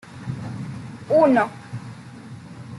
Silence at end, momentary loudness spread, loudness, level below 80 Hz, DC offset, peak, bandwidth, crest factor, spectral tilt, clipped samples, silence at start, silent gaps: 0 s; 23 LU; -21 LUFS; -60 dBFS; under 0.1%; -6 dBFS; 11.5 kHz; 18 dB; -7.5 dB/octave; under 0.1%; 0.05 s; none